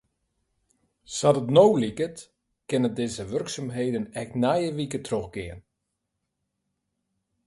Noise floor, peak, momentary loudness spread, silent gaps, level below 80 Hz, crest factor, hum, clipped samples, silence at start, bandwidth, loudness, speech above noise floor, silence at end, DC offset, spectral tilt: -81 dBFS; -4 dBFS; 15 LU; none; -58 dBFS; 24 dB; none; under 0.1%; 1.1 s; 11.5 kHz; -25 LUFS; 56 dB; 1.85 s; under 0.1%; -5.5 dB/octave